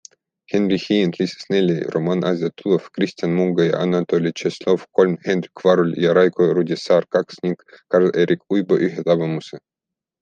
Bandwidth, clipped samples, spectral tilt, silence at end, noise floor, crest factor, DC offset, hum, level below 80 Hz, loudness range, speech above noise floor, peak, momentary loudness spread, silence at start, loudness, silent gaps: 8.6 kHz; under 0.1%; -7 dB/octave; 0.65 s; -86 dBFS; 16 dB; under 0.1%; none; -64 dBFS; 2 LU; 67 dB; -2 dBFS; 8 LU; 0.5 s; -19 LUFS; none